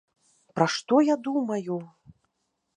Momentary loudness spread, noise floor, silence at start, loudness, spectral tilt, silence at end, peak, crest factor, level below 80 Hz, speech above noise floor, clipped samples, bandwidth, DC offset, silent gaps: 13 LU; -78 dBFS; 0.55 s; -25 LUFS; -5.5 dB/octave; 0.9 s; -6 dBFS; 22 dB; -74 dBFS; 53 dB; under 0.1%; 9.8 kHz; under 0.1%; none